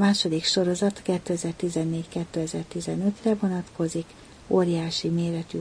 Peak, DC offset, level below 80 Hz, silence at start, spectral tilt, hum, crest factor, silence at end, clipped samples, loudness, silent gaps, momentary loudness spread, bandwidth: -8 dBFS; under 0.1%; -56 dBFS; 0 s; -5.5 dB/octave; none; 18 dB; 0 s; under 0.1%; -26 LUFS; none; 8 LU; 10.5 kHz